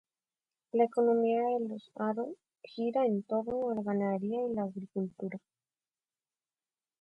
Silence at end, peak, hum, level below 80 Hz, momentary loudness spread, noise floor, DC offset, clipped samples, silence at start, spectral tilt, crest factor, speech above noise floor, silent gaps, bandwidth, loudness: 1.65 s; -16 dBFS; none; -76 dBFS; 14 LU; under -90 dBFS; under 0.1%; under 0.1%; 0.75 s; -9 dB/octave; 18 dB; over 58 dB; none; 8.4 kHz; -33 LUFS